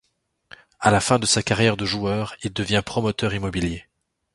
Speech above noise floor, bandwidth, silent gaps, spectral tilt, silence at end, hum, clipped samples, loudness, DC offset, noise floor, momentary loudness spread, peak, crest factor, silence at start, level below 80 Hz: 35 dB; 11.5 kHz; none; -4 dB/octave; 0.55 s; none; under 0.1%; -22 LUFS; under 0.1%; -57 dBFS; 9 LU; 0 dBFS; 22 dB; 0.8 s; -44 dBFS